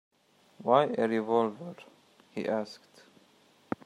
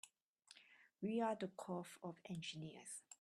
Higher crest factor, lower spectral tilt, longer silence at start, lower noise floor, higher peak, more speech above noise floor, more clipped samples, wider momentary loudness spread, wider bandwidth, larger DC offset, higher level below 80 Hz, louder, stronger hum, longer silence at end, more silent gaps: about the same, 24 dB vs 20 dB; first, -6.5 dB/octave vs -5 dB/octave; first, 0.6 s vs 0.05 s; second, -63 dBFS vs -71 dBFS; first, -8 dBFS vs -30 dBFS; first, 34 dB vs 24 dB; neither; about the same, 20 LU vs 22 LU; second, 11 kHz vs 13 kHz; neither; first, -78 dBFS vs -88 dBFS; first, -29 LUFS vs -47 LUFS; neither; first, 1.1 s vs 0.05 s; second, none vs 0.22-0.36 s